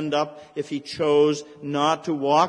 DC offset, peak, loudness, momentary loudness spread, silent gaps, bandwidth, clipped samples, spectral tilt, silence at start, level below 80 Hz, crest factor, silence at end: under 0.1%; -6 dBFS; -24 LUFS; 11 LU; none; 10 kHz; under 0.1%; -5 dB/octave; 0 s; -66 dBFS; 18 dB; 0 s